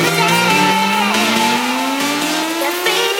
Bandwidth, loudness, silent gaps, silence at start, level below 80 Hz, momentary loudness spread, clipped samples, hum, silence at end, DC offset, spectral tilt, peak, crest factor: 16 kHz; -14 LUFS; none; 0 s; -60 dBFS; 5 LU; under 0.1%; none; 0 s; under 0.1%; -3 dB/octave; 0 dBFS; 14 dB